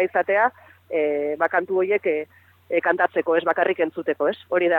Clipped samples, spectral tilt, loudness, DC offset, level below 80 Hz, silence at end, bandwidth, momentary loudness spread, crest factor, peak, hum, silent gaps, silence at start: under 0.1%; -7 dB/octave; -22 LUFS; under 0.1%; -78 dBFS; 0 s; 4.5 kHz; 5 LU; 16 dB; -6 dBFS; none; none; 0 s